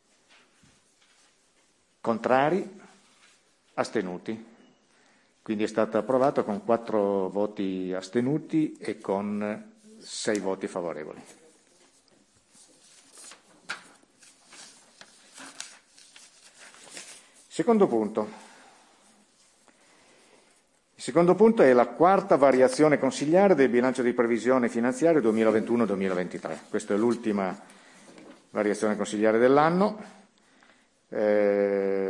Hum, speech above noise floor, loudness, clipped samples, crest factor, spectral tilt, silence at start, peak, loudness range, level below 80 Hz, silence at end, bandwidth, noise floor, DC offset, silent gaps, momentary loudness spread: none; 42 dB; -25 LUFS; under 0.1%; 20 dB; -6 dB/octave; 2.05 s; -6 dBFS; 23 LU; -74 dBFS; 0 s; 11.5 kHz; -66 dBFS; under 0.1%; none; 21 LU